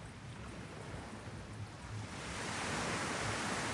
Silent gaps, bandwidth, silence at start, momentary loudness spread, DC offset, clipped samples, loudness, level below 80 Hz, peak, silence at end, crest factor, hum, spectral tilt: none; 11.5 kHz; 0 s; 11 LU; under 0.1%; under 0.1%; -41 LUFS; -58 dBFS; -26 dBFS; 0 s; 16 dB; none; -3.5 dB/octave